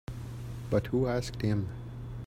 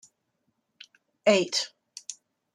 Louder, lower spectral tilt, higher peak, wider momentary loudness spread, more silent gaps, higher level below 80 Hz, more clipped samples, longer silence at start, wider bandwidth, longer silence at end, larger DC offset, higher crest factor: second, -33 LUFS vs -25 LUFS; first, -7 dB/octave vs -3 dB/octave; second, -14 dBFS vs -8 dBFS; second, 12 LU vs 19 LU; neither; first, -48 dBFS vs -78 dBFS; neither; second, 0.1 s vs 1.25 s; first, 15.5 kHz vs 13 kHz; second, 0 s vs 0.4 s; neither; about the same, 18 dB vs 22 dB